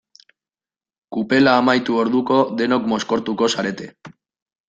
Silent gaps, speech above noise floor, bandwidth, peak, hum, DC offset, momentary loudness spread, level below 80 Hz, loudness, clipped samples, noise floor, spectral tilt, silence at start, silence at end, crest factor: none; over 72 dB; 8.8 kHz; -2 dBFS; none; under 0.1%; 13 LU; -60 dBFS; -18 LUFS; under 0.1%; under -90 dBFS; -5 dB/octave; 1.1 s; 0.6 s; 18 dB